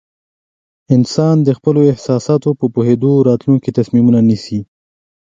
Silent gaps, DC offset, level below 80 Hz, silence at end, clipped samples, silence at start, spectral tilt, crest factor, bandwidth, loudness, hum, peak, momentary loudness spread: none; under 0.1%; -52 dBFS; 0.75 s; under 0.1%; 0.9 s; -8.5 dB/octave; 14 dB; 7.8 kHz; -13 LUFS; none; 0 dBFS; 5 LU